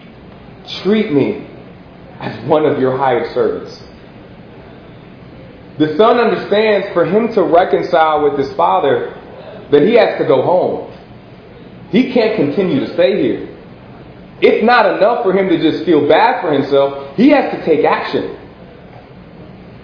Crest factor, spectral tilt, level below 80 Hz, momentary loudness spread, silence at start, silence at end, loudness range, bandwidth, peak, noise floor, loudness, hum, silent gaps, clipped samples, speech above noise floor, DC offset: 14 dB; -8 dB/octave; -50 dBFS; 16 LU; 0 s; 0 s; 6 LU; 5.4 kHz; 0 dBFS; -36 dBFS; -13 LUFS; none; none; under 0.1%; 24 dB; under 0.1%